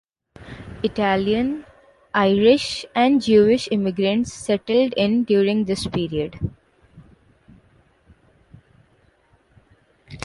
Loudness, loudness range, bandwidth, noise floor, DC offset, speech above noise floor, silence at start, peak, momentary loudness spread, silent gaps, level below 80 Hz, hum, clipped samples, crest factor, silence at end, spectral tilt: -20 LUFS; 13 LU; 11.5 kHz; -59 dBFS; under 0.1%; 40 dB; 0.4 s; -4 dBFS; 13 LU; none; -48 dBFS; none; under 0.1%; 18 dB; 0 s; -5.5 dB/octave